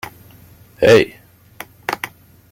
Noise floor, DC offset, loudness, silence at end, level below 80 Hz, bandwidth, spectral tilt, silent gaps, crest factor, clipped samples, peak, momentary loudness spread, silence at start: -45 dBFS; under 0.1%; -16 LUFS; 0.45 s; -52 dBFS; 17 kHz; -5 dB/octave; none; 18 dB; under 0.1%; 0 dBFS; 24 LU; 0.8 s